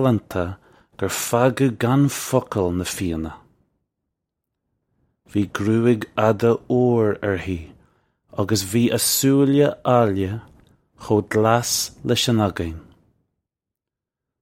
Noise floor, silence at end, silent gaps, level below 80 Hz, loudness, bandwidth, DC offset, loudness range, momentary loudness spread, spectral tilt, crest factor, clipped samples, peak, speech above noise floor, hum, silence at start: -86 dBFS; 1.6 s; none; -48 dBFS; -20 LUFS; 16.5 kHz; under 0.1%; 6 LU; 12 LU; -5 dB/octave; 20 dB; under 0.1%; -2 dBFS; 67 dB; none; 0 s